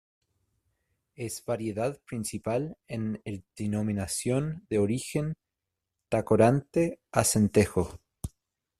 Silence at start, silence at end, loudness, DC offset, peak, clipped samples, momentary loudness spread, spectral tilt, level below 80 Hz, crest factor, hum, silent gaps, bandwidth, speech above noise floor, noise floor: 1.2 s; 0.5 s; -29 LUFS; under 0.1%; -8 dBFS; under 0.1%; 15 LU; -5.5 dB/octave; -56 dBFS; 22 dB; none; none; 14.5 kHz; 58 dB; -86 dBFS